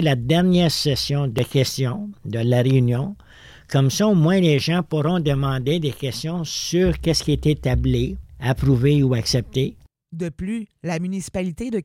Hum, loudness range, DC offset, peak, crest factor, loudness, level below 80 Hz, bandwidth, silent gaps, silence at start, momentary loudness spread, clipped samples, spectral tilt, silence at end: none; 3 LU; under 0.1%; -6 dBFS; 14 dB; -21 LUFS; -38 dBFS; 16 kHz; none; 0 s; 11 LU; under 0.1%; -6 dB/octave; 0 s